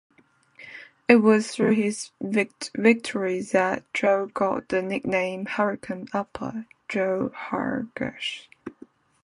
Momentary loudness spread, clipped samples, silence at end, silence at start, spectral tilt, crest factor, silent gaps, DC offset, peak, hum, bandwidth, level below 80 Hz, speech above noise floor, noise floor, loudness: 13 LU; under 0.1%; 0.55 s; 0.6 s; -5 dB/octave; 24 dB; none; under 0.1%; -2 dBFS; none; 11 kHz; -64 dBFS; 32 dB; -56 dBFS; -25 LUFS